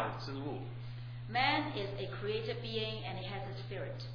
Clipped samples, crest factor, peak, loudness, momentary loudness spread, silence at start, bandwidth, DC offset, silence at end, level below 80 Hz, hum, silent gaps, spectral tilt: under 0.1%; 22 dB; -16 dBFS; -38 LUFS; 12 LU; 0 s; 5.4 kHz; under 0.1%; 0 s; -58 dBFS; none; none; -7 dB/octave